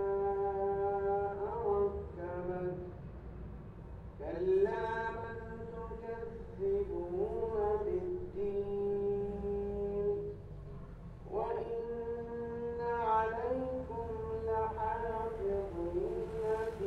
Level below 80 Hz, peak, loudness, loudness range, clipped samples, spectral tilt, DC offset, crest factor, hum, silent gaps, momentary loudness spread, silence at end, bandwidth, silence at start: -50 dBFS; -20 dBFS; -37 LUFS; 3 LU; under 0.1%; -9 dB/octave; under 0.1%; 16 dB; none; none; 15 LU; 0 s; 6 kHz; 0 s